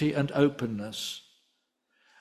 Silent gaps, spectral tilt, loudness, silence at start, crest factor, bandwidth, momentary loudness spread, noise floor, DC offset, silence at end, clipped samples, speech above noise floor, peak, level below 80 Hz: none; -6 dB/octave; -29 LUFS; 0 s; 20 dB; 14 kHz; 11 LU; -76 dBFS; under 0.1%; 1 s; under 0.1%; 48 dB; -10 dBFS; -66 dBFS